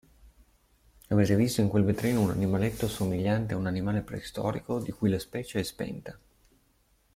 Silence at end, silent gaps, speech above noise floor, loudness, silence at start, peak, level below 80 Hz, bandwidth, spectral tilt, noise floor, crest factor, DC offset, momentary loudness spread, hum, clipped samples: 1 s; none; 39 dB; -29 LUFS; 0.25 s; -12 dBFS; -52 dBFS; 16 kHz; -6.5 dB/octave; -67 dBFS; 18 dB; under 0.1%; 10 LU; none; under 0.1%